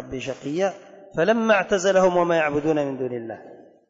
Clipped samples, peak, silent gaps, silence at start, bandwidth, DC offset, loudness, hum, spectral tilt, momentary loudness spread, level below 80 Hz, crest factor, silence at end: under 0.1%; -8 dBFS; none; 0 s; 7.8 kHz; under 0.1%; -22 LUFS; none; -5 dB/octave; 14 LU; -56 dBFS; 14 dB; 0.35 s